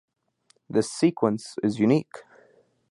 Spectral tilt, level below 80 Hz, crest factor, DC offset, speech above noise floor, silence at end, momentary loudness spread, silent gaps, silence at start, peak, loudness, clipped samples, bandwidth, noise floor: -6.5 dB/octave; -68 dBFS; 20 dB; under 0.1%; 42 dB; 0.7 s; 11 LU; none; 0.7 s; -6 dBFS; -25 LUFS; under 0.1%; 11.5 kHz; -66 dBFS